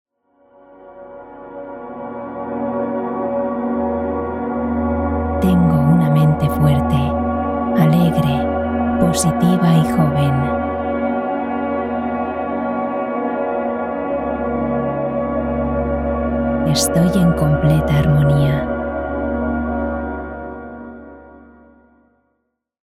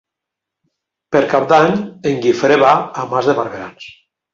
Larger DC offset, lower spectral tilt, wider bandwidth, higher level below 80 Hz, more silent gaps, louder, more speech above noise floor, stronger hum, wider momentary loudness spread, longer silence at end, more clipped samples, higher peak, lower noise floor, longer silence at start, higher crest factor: neither; about the same, -7 dB/octave vs -6 dB/octave; first, 15 kHz vs 7.6 kHz; first, -34 dBFS vs -56 dBFS; neither; second, -18 LUFS vs -14 LUFS; second, 57 dB vs 68 dB; neither; first, 14 LU vs 10 LU; first, 1.45 s vs 0.45 s; neither; about the same, -2 dBFS vs -2 dBFS; second, -71 dBFS vs -82 dBFS; second, 0.8 s vs 1.1 s; about the same, 16 dB vs 16 dB